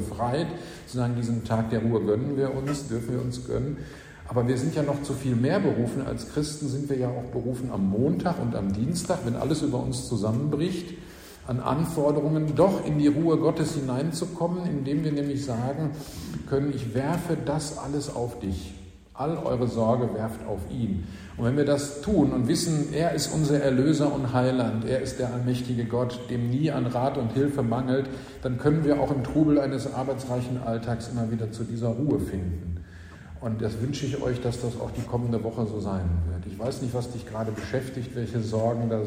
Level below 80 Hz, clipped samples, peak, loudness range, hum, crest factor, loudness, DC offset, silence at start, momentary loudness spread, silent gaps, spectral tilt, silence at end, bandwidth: -46 dBFS; under 0.1%; -8 dBFS; 5 LU; none; 18 dB; -27 LUFS; under 0.1%; 0 s; 10 LU; none; -7 dB/octave; 0 s; 16 kHz